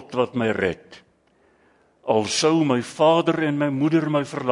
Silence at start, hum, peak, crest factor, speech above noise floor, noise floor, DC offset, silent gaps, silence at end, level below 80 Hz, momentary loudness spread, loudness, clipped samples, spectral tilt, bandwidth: 0 s; none; -6 dBFS; 16 dB; 40 dB; -61 dBFS; under 0.1%; none; 0 s; -64 dBFS; 7 LU; -21 LUFS; under 0.1%; -5 dB/octave; 11 kHz